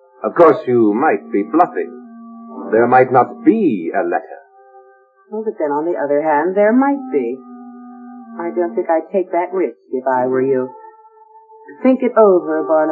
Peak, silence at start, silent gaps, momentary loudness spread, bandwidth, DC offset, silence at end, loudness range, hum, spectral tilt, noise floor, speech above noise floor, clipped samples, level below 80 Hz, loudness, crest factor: 0 dBFS; 0.2 s; none; 22 LU; 4.8 kHz; under 0.1%; 0 s; 4 LU; none; -10 dB/octave; -49 dBFS; 34 dB; under 0.1%; -72 dBFS; -16 LUFS; 16 dB